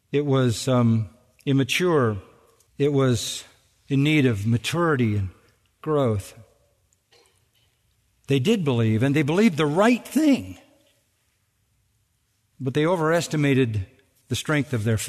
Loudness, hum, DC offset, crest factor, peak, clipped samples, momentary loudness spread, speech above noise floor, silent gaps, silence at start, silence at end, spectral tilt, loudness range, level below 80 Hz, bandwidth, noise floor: -22 LUFS; none; under 0.1%; 18 dB; -6 dBFS; under 0.1%; 12 LU; 48 dB; none; 0.1 s; 0 s; -6 dB/octave; 5 LU; -58 dBFS; 13.5 kHz; -69 dBFS